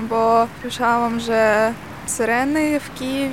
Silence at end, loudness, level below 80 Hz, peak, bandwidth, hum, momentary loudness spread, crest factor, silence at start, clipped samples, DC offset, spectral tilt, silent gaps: 0 s; -19 LUFS; -50 dBFS; -4 dBFS; 17 kHz; none; 7 LU; 16 dB; 0 s; under 0.1%; 0.4%; -4 dB/octave; none